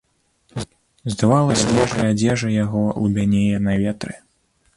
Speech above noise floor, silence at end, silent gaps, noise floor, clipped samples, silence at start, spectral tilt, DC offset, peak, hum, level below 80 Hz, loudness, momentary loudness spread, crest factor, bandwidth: 45 dB; 0.6 s; none; -63 dBFS; under 0.1%; 0.55 s; -6 dB/octave; under 0.1%; -2 dBFS; none; -44 dBFS; -19 LUFS; 16 LU; 16 dB; 11.5 kHz